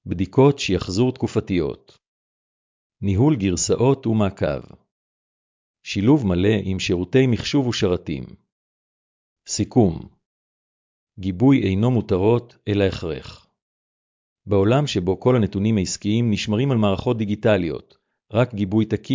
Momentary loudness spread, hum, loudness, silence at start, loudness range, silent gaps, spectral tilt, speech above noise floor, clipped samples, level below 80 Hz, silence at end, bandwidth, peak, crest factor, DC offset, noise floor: 11 LU; none; -20 LUFS; 0.05 s; 3 LU; 2.08-2.90 s, 4.91-5.74 s, 8.52-9.36 s, 10.26-11.07 s, 13.62-14.36 s; -6.5 dB/octave; over 70 dB; under 0.1%; -42 dBFS; 0 s; 7.6 kHz; -4 dBFS; 16 dB; under 0.1%; under -90 dBFS